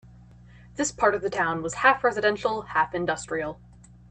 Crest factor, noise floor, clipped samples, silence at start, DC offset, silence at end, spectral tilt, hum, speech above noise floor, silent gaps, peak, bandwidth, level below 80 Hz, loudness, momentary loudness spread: 22 dB; -50 dBFS; under 0.1%; 0.55 s; under 0.1%; 0.55 s; -3.5 dB/octave; 60 Hz at -45 dBFS; 25 dB; none; -6 dBFS; 9.2 kHz; -54 dBFS; -25 LUFS; 10 LU